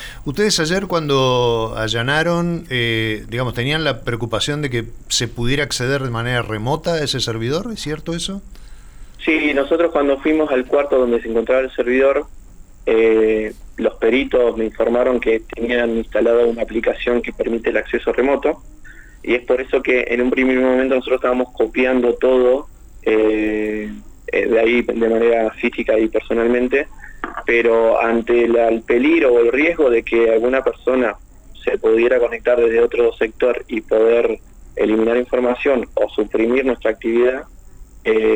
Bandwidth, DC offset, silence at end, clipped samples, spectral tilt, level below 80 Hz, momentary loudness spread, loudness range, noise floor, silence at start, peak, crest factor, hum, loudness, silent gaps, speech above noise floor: 20 kHz; under 0.1%; 0 s; under 0.1%; -5 dB/octave; -38 dBFS; 8 LU; 4 LU; -39 dBFS; 0 s; -4 dBFS; 12 dB; none; -17 LUFS; none; 22 dB